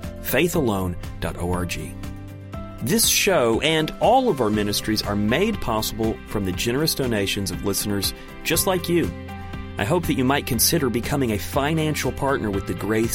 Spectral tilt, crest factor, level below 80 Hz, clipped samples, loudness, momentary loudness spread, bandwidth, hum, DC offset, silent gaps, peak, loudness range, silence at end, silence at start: -4 dB/octave; 18 dB; -38 dBFS; under 0.1%; -22 LUFS; 12 LU; 16.5 kHz; none; under 0.1%; none; -4 dBFS; 4 LU; 0 s; 0 s